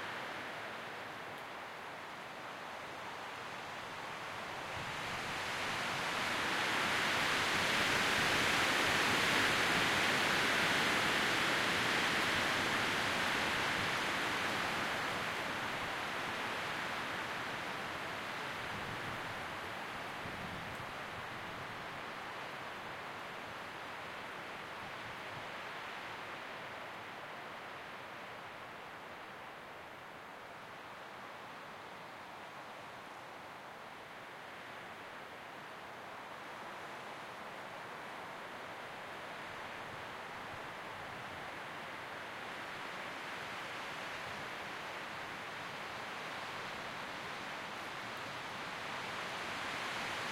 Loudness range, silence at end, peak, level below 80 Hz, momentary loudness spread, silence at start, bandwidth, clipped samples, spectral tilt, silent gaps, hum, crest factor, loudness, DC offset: 18 LU; 0 s; -20 dBFS; -68 dBFS; 17 LU; 0 s; 16.5 kHz; under 0.1%; -2.5 dB/octave; none; none; 20 dB; -38 LUFS; under 0.1%